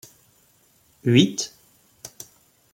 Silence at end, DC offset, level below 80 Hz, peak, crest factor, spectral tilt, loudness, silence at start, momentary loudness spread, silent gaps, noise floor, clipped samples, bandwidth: 0.65 s; under 0.1%; -66 dBFS; -4 dBFS; 22 dB; -5 dB/octave; -21 LUFS; 1.05 s; 25 LU; none; -60 dBFS; under 0.1%; 16.5 kHz